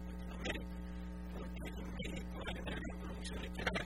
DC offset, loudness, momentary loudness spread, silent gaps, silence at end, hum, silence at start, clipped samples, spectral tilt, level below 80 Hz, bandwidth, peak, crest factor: 0.1%; -45 LUFS; 5 LU; none; 0 s; none; 0 s; under 0.1%; -5 dB/octave; -48 dBFS; 15.5 kHz; -20 dBFS; 22 dB